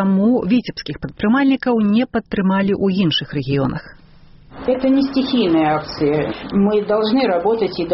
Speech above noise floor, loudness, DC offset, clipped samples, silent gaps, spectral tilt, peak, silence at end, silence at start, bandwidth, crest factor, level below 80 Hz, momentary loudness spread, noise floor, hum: 27 dB; -17 LUFS; under 0.1%; under 0.1%; none; -5 dB/octave; -6 dBFS; 0 s; 0 s; 6 kHz; 12 dB; -44 dBFS; 6 LU; -44 dBFS; none